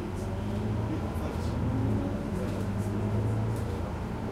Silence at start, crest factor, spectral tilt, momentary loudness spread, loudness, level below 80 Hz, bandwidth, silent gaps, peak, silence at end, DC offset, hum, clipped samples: 0 s; 14 dB; -8 dB/octave; 4 LU; -32 LUFS; -40 dBFS; 14 kHz; none; -18 dBFS; 0 s; under 0.1%; none; under 0.1%